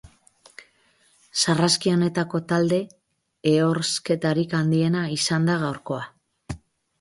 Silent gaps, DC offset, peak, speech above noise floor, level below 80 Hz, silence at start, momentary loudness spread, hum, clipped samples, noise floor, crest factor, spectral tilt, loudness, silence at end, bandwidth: none; under 0.1%; -6 dBFS; 40 dB; -56 dBFS; 0.05 s; 17 LU; none; under 0.1%; -62 dBFS; 18 dB; -5 dB/octave; -23 LUFS; 0.45 s; 11.5 kHz